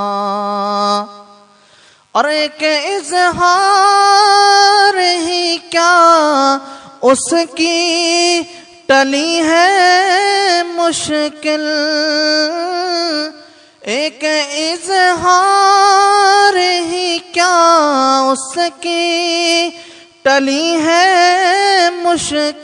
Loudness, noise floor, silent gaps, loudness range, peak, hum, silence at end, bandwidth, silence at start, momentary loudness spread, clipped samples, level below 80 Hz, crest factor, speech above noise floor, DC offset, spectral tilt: -12 LUFS; -47 dBFS; none; 5 LU; 0 dBFS; none; 0 s; 10.5 kHz; 0 s; 9 LU; under 0.1%; -58 dBFS; 12 dB; 35 dB; under 0.1%; -1.5 dB/octave